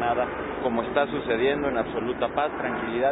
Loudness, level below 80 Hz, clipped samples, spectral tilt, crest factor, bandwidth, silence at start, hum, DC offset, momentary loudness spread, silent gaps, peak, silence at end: -26 LUFS; -50 dBFS; under 0.1%; -10 dB/octave; 16 dB; 4 kHz; 0 s; none; under 0.1%; 5 LU; none; -10 dBFS; 0 s